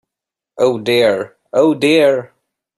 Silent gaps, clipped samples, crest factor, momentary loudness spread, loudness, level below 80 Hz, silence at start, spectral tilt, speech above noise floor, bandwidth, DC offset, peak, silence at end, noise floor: none; under 0.1%; 14 dB; 8 LU; -14 LUFS; -60 dBFS; 0.55 s; -5 dB/octave; 71 dB; 12.5 kHz; under 0.1%; -2 dBFS; 0.55 s; -85 dBFS